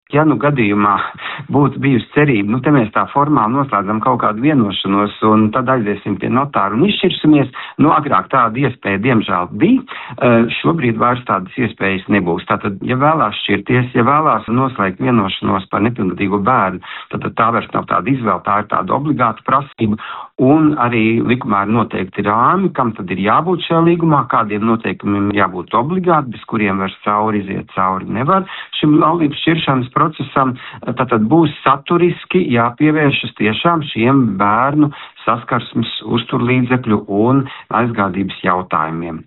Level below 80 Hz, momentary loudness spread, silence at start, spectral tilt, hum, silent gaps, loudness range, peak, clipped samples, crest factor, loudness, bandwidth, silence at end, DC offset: -50 dBFS; 6 LU; 0.1 s; -5 dB/octave; none; none; 2 LU; 0 dBFS; under 0.1%; 14 dB; -15 LUFS; 4.1 kHz; 0.05 s; under 0.1%